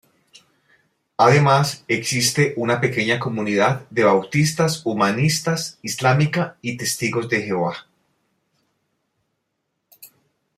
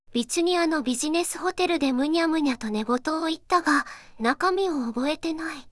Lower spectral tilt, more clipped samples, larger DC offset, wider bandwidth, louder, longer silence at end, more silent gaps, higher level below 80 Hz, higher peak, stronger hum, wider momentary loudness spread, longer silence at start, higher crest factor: first, -4.5 dB/octave vs -3 dB/octave; neither; neither; first, 15.5 kHz vs 12 kHz; first, -19 LUFS vs -25 LUFS; first, 0.5 s vs 0 s; neither; about the same, -60 dBFS vs -56 dBFS; first, -2 dBFS vs -8 dBFS; neither; first, 8 LU vs 5 LU; first, 1.2 s vs 0.1 s; about the same, 20 dB vs 18 dB